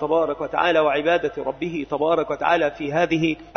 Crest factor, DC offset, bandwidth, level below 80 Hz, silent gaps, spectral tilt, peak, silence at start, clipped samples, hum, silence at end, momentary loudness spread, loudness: 16 dB; under 0.1%; 6.6 kHz; -52 dBFS; none; -6 dB/octave; -4 dBFS; 0 s; under 0.1%; none; 0.05 s; 8 LU; -21 LUFS